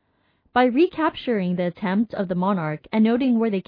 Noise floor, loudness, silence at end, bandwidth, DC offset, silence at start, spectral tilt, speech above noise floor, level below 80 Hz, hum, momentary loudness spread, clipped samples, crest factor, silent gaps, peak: -65 dBFS; -22 LUFS; 0.05 s; 5.2 kHz; under 0.1%; 0.55 s; -10 dB/octave; 44 dB; -60 dBFS; none; 6 LU; under 0.1%; 16 dB; none; -6 dBFS